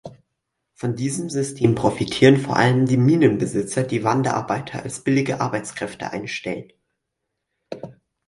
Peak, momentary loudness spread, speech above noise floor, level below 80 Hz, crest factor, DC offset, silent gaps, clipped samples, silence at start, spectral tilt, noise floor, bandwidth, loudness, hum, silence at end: 0 dBFS; 15 LU; 59 dB; -54 dBFS; 20 dB; under 0.1%; none; under 0.1%; 0.05 s; -6 dB/octave; -79 dBFS; 11.5 kHz; -21 LUFS; none; 0.35 s